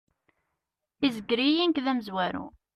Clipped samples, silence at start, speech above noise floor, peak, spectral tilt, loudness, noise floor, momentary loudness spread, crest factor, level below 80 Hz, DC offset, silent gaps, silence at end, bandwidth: under 0.1%; 1 s; 57 dB; -12 dBFS; -5.5 dB/octave; -27 LUFS; -84 dBFS; 7 LU; 18 dB; -66 dBFS; under 0.1%; none; 0.25 s; 13.5 kHz